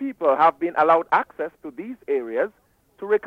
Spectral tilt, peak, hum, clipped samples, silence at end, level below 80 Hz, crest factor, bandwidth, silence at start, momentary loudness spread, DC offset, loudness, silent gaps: -6.5 dB/octave; -6 dBFS; none; under 0.1%; 0 s; -68 dBFS; 16 dB; 6.4 kHz; 0 s; 17 LU; under 0.1%; -21 LUFS; none